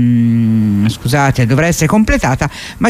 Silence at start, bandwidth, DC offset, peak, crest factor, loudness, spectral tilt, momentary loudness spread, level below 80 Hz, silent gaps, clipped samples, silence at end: 0 s; 15.5 kHz; under 0.1%; 0 dBFS; 10 dB; -12 LUFS; -6 dB/octave; 4 LU; -28 dBFS; none; under 0.1%; 0 s